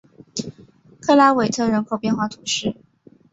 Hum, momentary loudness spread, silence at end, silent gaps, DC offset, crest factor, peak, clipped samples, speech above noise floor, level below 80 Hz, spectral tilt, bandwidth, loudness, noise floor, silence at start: none; 17 LU; 0.6 s; none; under 0.1%; 20 dB; -2 dBFS; under 0.1%; 31 dB; -58 dBFS; -4 dB/octave; 8 kHz; -20 LUFS; -49 dBFS; 0.35 s